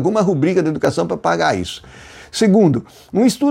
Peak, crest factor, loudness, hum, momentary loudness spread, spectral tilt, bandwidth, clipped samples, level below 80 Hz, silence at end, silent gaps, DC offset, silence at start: -4 dBFS; 12 dB; -16 LUFS; none; 11 LU; -6 dB/octave; 16.5 kHz; under 0.1%; -52 dBFS; 0 s; none; under 0.1%; 0 s